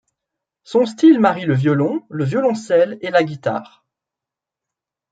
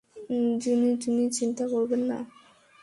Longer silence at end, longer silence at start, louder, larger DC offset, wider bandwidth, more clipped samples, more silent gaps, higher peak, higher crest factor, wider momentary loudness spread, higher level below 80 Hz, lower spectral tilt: first, 1.5 s vs 0.55 s; first, 0.7 s vs 0.15 s; first, -17 LUFS vs -27 LUFS; neither; second, 9 kHz vs 11.5 kHz; neither; neither; first, -2 dBFS vs -14 dBFS; about the same, 16 dB vs 12 dB; about the same, 10 LU vs 8 LU; first, -64 dBFS vs -70 dBFS; first, -7.5 dB/octave vs -4.5 dB/octave